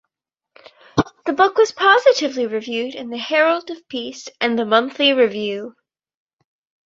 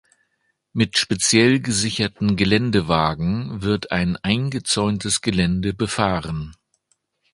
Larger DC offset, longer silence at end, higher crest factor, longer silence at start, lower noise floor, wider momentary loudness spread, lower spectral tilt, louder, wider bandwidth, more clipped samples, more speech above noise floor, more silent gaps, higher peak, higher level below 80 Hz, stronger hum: neither; first, 1.15 s vs 0.8 s; about the same, 18 dB vs 20 dB; first, 0.95 s vs 0.75 s; first, -82 dBFS vs -70 dBFS; first, 14 LU vs 7 LU; about the same, -4 dB/octave vs -4 dB/octave; about the same, -18 LUFS vs -20 LUFS; second, 7.8 kHz vs 11.5 kHz; neither; first, 64 dB vs 50 dB; neither; about the same, -2 dBFS vs 0 dBFS; second, -54 dBFS vs -42 dBFS; neither